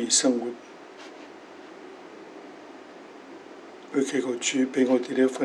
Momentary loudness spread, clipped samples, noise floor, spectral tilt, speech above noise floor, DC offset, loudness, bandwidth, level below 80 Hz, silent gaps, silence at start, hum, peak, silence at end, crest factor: 22 LU; under 0.1%; -45 dBFS; -2 dB/octave; 21 dB; under 0.1%; -25 LUFS; 12 kHz; -88 dBFS; none; 0 s; none; -8 dBFS; 0 s; 20 dB